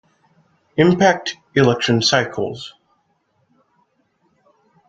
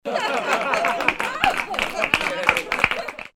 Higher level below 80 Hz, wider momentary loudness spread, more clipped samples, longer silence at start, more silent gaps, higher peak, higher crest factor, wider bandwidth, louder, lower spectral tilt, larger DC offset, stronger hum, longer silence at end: second, -56 dBFS vs -48 dBFS; first, 13 LU vs 4 LU; neither; first, 0.75 s vs 0.05 s; neither; about the same, 0 dBFS vs 0 dBFS; about the same, 20 dB vs 22 dB; second, 9 kHz vs over 20 kHz; first, -17 LUFS vs -21 LUFS; first, -5 dB/octave vs -2.5 dB/octave; neither; neither; first, 2.2 s vs 0.05 s